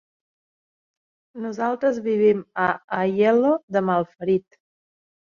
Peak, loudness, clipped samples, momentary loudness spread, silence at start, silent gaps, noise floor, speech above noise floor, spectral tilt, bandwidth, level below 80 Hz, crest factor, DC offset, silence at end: -6 dBFS; -22 LUFS; under 0.1%; 7 LU; 1.35 s; 2.84-2.88 s, 3.63-3.68 s; under -90 dBFS; over 69 dB; -7.5 dB/octave; 7 kHz; -68 dBFS; 18 dB; under 0.1%; 0.85 s